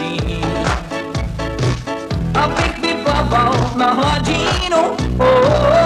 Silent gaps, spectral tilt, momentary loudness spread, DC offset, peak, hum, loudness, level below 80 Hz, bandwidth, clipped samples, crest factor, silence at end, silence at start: none; -5.5 dB/octave; 10 LU; under 0.1%; -2 dBFS; none; -16 LUFS; -28 dBFS; 13.5 kHz; under 0.1%; 14 dB; 0 s; 0 s